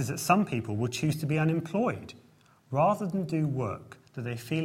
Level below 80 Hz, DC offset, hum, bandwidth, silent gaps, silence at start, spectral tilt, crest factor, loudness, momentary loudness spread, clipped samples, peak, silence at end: -64 dBFS; under 0.1%; none; 16.5 kHz; none; 0 s; -6 dB/octave; 20 dB; -29 LUFS; 14 LU; under 0.1%; -10 dBFS; 0 s